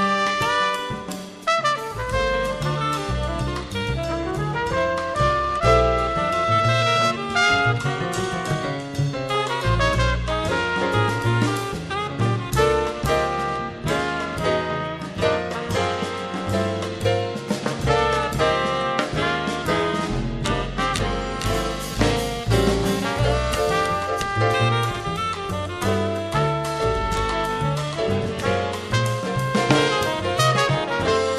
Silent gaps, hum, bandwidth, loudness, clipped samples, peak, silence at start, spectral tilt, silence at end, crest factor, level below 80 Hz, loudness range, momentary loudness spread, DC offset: none; none; 14 kHz; -22 LUFS; under 0.1%; -2 dBFS; 0 s; -5 dB/octave; 0 s; 20 dB; -36 dBFS; 4 LU; 7 LU; under 0.1%